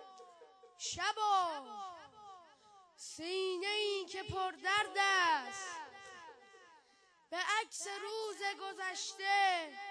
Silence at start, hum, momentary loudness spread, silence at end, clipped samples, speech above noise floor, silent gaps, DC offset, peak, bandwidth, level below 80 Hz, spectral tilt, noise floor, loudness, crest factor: 0 s; none; 21 LU; 0 s; under 0.1%; 32 dB; none; under 0.1%; -20 dBFS; 11 kHz; -74 dBFS; -1.5 dB/octave; -69 dBFS; -36 LUFS; 18 dB